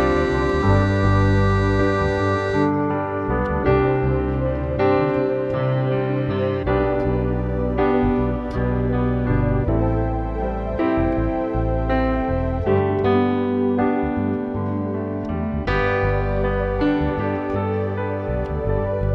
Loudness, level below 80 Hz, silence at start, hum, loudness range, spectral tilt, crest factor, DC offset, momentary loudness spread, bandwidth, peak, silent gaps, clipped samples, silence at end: -21 LUFS; -30 dBFS; 0 s; none; 3 LU; -9 dB/octave; 14 dB; under 0.1%; 6 LU; 7.8 kHz; -6 dBFS; none; under 0.1%; 0 s